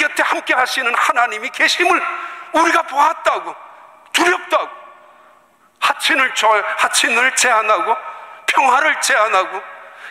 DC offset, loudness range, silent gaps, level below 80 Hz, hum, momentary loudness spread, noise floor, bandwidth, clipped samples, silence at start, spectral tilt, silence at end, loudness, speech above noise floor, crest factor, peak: under 0.1%; 4 LU; none; -66 dBFS; none; 11 LU; -52 dBFS; 16 kHz; under 0.1%; 0 s; 0.5 dB/octave; 0 s; -15 LUFS; 36 dB; 16 dB; -2 dBFS